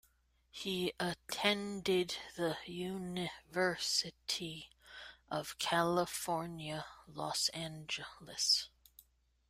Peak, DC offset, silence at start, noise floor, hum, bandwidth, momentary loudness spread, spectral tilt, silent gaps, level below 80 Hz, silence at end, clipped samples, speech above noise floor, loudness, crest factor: -16 dBFS; under 0.1%; 0.55 s; -73 dBFS; none; 16 kHz; 14 LU; -3 dB/octave; none; -70 dBFS; 0.8 s; under 0.1%; 35 dB; -37 LUFS; 24 dB